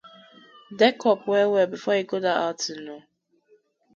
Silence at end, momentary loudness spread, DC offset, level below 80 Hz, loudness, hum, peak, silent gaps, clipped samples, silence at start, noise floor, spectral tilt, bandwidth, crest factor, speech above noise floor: 0.95 s; 19 LU; under 0.1%; -76 dBFS; -23 LUFS; none; -4 dBFS; none; under 0.1%; 0.7 s; -62 dBFS; -4 dB/octave; 7.6 kHz; 20 dB; 39 dB